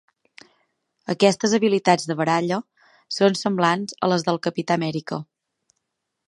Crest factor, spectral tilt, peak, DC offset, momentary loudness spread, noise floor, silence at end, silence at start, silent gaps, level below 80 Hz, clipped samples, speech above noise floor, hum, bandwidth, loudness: 22 dB; -5 dB/octave; -2 dBFS; under 0.1%; 11 LU; -78 dBFS; 1.05 s; 1.1 s; none; -70 dBFS; under 0.1%; 57 dB; none; 11.5 kHz; -22 LUFS